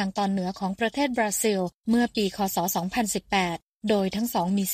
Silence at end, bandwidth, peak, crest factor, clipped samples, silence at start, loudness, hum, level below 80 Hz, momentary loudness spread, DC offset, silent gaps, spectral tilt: 0 s; 15.5 kHz; -10 dBFS; 16 dB; under 0.1%; 0 s; -26 LUFS; none; -56 dBFS; 4 LU; under 0.1%; 1.76-1.81 s, 3.62-3.80 s; -4 dB/octave